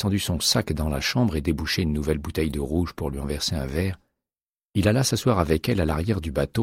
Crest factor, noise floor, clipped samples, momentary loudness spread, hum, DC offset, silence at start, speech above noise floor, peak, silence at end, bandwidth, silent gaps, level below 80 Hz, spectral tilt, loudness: 18 dB; under -90 dBFS; under 0.1%; 7 LU; none; under 0.1%; 0 s; over 66 dB; -6 dBFS; 0 s; 16 kHz; 4.49-4.57 s, 4.65-4.70 s; -36 dBFS; -5 dB/octave; -24 LUFS